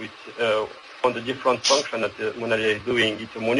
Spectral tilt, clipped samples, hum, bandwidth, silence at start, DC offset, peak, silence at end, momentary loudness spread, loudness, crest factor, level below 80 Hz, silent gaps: -3 dB/octave; under 0.1%; none; 11.5 kHz; 0 s; under 0.1%; -4 dBFS; 0 s; 8 LU; -23 LUFS; 20 dB; -60 dBFS; none